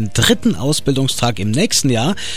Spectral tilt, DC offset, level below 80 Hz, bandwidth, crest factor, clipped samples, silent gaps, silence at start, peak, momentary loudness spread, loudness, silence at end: -4 dB/octave; 5%; -38 dBFS; 16 kHz; 16 dB; under 0.1%; none; 0 s; 0 dBFS; 4 LU; -15 LUFS; 0 s